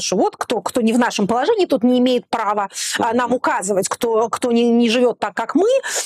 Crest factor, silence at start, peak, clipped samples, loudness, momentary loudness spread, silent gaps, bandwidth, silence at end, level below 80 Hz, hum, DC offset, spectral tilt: 12 dB; 0 s; -6 dBFS; under 0.1%; -18 LUFS; 5 LU; none; 15 kHz; 0 s; -62 dBFS; none; under 0.1%; -3.5 dB/octave